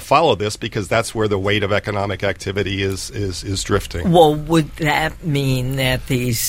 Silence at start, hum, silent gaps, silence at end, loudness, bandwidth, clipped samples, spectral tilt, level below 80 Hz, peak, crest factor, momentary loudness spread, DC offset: 0 s; none; none; 0 s; -19 LUFS; 16 kHz; under 0.1%; -5 dB/octave; -36 dBFS; 0 dBFS; 18 dB; 9 LU; under 0.1%